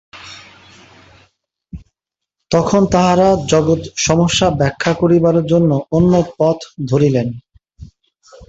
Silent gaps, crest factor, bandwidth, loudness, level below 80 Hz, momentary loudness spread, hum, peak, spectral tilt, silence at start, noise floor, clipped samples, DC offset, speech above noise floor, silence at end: none; 16 dB; 8.2 kHz; -14 LUFS; -40 dBFS; 9 LU; none; 0 dBFS; -5.5 dB/octave; 0.15 s; -81 dBFS; under 0.1%; under 0.1%; 68 dB; 0.05 s